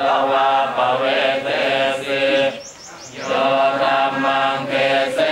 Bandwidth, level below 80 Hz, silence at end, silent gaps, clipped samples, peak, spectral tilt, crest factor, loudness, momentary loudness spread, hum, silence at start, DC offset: 13 kHz; -62 dBFS; 0 s; none; under 0.1%; -4 dBFS; -3.5 dB/octave; 14 dB; -17 LUFS; 7 LU; none; 0 s; under 0.1%